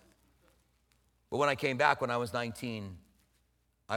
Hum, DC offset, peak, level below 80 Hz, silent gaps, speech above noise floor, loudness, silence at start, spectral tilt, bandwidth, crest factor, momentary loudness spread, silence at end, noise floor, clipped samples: none; under 0.1%; -10 dBFS; -68 dBFS; none; 42 dB; -32 LUFS; 1.3 s; -5 dB/octave; 17.5 kHz; 26 dB; 12 LU; 0 s; -74 dBFS; under 0.1%